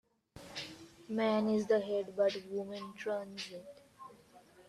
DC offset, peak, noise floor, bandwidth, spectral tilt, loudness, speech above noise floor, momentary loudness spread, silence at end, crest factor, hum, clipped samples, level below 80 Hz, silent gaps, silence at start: under 0.1%; -20 dBFS; -61 dBFS; 13.5 kHz; -5.5 dB/octave; -36 LUFS; 26 dB; 23 LU; 0.05 s; 18 dB; none; under 0.1%; -76 dBFS; none; 0.35 s